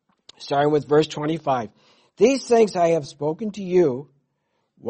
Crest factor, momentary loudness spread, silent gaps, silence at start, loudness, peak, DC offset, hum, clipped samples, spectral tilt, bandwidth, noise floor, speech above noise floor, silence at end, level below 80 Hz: 18 dB; 10 LU; none; 0.4 s; -21 LUFS; -4 dBFS; under 0.1%; none; under 0.1%; -6 dB/octave; 8.8 kHz; -73 dBFS; 52 dB; 0 s; -62 dBFS